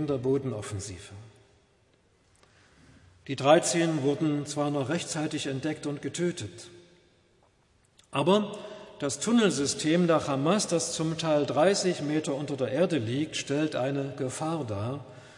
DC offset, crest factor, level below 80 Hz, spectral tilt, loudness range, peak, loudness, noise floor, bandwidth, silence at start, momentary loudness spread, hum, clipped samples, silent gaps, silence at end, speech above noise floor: under 0.1%; 22 dB; -68 dBFS; -5 dB/octave; 7 LU; -6 dBFS; -28 LUFS; -65 dBFS; 11.5 kHz; 0 s; 13 LU; none; under 0.1%; none; 0 s; 38 dB